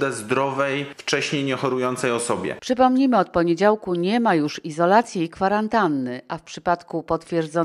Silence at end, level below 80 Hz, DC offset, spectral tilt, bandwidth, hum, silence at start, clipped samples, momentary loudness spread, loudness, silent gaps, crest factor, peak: 0 s; -56 dBFS; under 0.1%; -5 dB/octave; 12.5 kHz; none; 0 s; under 0.1%; 8 LU; -21 LUFS; none; 18 dB; -2 dBFS